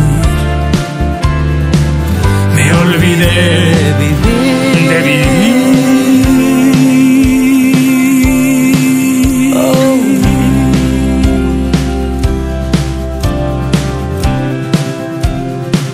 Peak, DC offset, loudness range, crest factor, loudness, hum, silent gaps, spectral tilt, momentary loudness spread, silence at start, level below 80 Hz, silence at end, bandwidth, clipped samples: 0 dBFS; under 0.1%; 6 LU; 10 dB; -10 LUFS; none; none; -6 dB/octave; 7 LU; 0 s; -18 dBFS; 0 s; 16 kHz; 0.2%